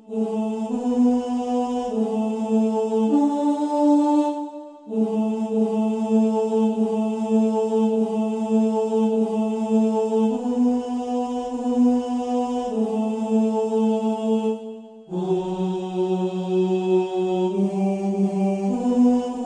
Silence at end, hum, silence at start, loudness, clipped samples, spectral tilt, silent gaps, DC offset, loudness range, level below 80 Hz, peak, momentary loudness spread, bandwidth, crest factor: 0 s; none; 0.1 s; -22 LUFS; under 0.1%; -8 dB/octave; none; under 0.1%; 2 LU; -62 dBFS; -8 dBFS; 6 LU; 9.8 kHz; 12 dB